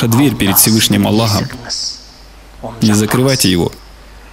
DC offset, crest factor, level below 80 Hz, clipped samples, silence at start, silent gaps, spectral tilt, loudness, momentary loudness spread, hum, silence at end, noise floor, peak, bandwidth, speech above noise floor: under 0.1%; 14 dB; -38 dBFS; under 0.1%; 0 s; none; -4 dB/octave; -12 LUFS; 13 LU; none; 0.05 s; -37 dBFS; 0 dBFS; 16.5 kHz; 25 dB